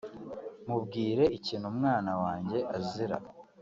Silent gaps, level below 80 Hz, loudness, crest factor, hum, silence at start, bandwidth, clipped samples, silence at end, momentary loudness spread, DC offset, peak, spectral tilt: none; -64 dBFS; -32 LUFS; 18 dB; none; 0.05 s; 7.6 kHz; under 0.1%; 0 s; 15 LU; under 0.1%; -14 dBFS; -5.5 dB/octave